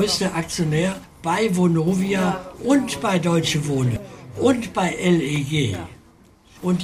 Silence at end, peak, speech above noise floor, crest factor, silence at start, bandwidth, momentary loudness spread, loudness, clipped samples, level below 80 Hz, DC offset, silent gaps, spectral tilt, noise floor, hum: 0 s; -6 dBFS; 31 dB; 16 dB; 0 s; 15.5 kHz; 8 LU; -21 LUFS; under 0.1%; -48 dBFS; under 0.1%; none; -5.5 dB/octave; -51 dBFS; none